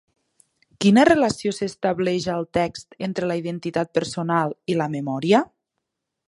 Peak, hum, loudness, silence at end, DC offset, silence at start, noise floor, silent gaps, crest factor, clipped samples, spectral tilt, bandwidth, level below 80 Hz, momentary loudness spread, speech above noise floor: -2 dBFS; none; -22 LUFS; 0.85 s; under 0.1%; 0.8 s; -80 dBFS; none; 20 dB; under 0.1%; -5.5 dB/octave; 11.5 kHz; -56 dBFS; 10 LU; 59 dB